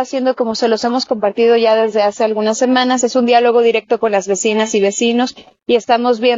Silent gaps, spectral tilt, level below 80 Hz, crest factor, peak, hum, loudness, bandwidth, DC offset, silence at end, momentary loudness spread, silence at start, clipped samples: none; -3 dB/octave; -62 dBFS; 14 dB; 0 dBFS; none; -14 LUFS; 7.6 kHz; under 0.1%; 0 s; 5 LU; 0 s; under 0.1%